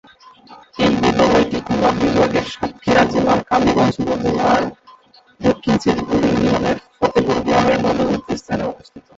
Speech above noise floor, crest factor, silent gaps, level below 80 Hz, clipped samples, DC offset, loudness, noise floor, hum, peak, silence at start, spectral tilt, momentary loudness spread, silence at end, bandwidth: 32 dB; 16 dB; none; -40 dBFS; under 0.1%; under 0.1%; -17 LUFS; -48 dBFS; none; -2 dBFS; 0.5 s; -6 dB/octave; 9 LU; 0.15 s; 8 kHz